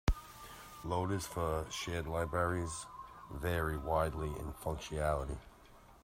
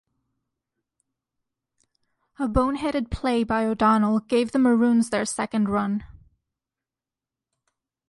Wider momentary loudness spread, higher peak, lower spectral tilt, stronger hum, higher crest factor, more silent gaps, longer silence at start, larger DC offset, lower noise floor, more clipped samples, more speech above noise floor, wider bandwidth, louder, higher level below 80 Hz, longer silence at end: first, 14 LU vs 7 LU; second, -16 dBFS vs -8 dBFS; about the same, -5.5 dB/octave vs -5.5 dB/octave; neither; about the same, 22 dB vs 18 dB; neither; second, 0.05 s vs 2.4 s; neither; second, -59 dBFS vs -90 dBFS; neither; second, 23 dB vs 68 dB; first, 16 kHz vs 11.5 kHz; second, -38 LUFS vs -23 LUFS; about the same, -46 dBFS vs -44 dBFS; second, 0.05 s vs 2 s